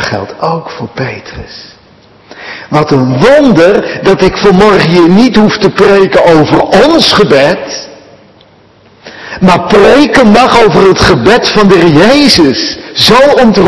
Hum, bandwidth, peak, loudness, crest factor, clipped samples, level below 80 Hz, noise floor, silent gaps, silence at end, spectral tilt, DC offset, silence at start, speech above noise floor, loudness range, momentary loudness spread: none; 12 kHz; 0 dBFS; -5 LUFS; 6 dB; 10%; -32 dBFS; -41 dBFS; none; 0 s; -5.5 dB/octave; under 0.1%; 0 s; 35 dB; 5 LU; 14 LU